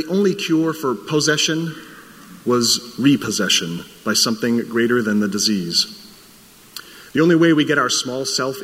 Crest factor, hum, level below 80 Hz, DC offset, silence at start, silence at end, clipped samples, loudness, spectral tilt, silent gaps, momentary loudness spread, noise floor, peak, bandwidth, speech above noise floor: 16 dB; none; -62 dBFS; under 0.1%; 0 s; 0 s; under 0.1%; -18 LUFS; -3.5 dB/octave; none; 12 LU; -46 dBFS; -2 dBFS; 16 kHz; 28 dB